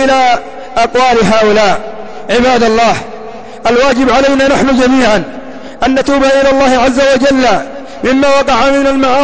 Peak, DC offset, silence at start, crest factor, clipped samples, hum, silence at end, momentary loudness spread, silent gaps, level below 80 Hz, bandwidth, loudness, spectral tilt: 0 dBFS; 5%; 0 s; 8 dB; under 0.1%; none; 0 s; 11 LU; none; -34 dBFS; 8 kHz; -9 LUFS; -4 dB/octave